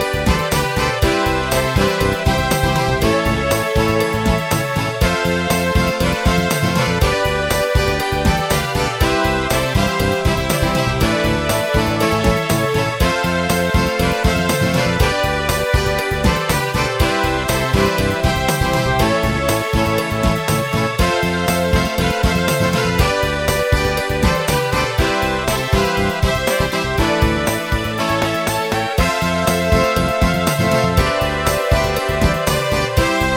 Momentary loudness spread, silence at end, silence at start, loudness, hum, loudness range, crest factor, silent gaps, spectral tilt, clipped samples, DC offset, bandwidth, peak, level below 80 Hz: 2 LU; 0 s; 0 s; -17 LUFS; none; 1 LU; 16 dB; none; -4.5 dB/octave; under 0.1%; under 0.1%; 16.5 kHz; -2 dBFS; -26 dBFS